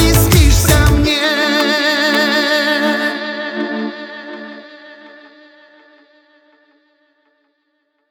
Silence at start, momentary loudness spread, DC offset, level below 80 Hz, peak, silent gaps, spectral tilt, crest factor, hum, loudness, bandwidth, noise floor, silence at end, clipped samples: 0 s; 19 LU; under 0.1%; -22 dBFS; 0 dBFS; none; -4 dB/octave; 16 dB; none; -13 LUFS; over 20 kHz; -66 dBFS; 3.05 s; under 0.1%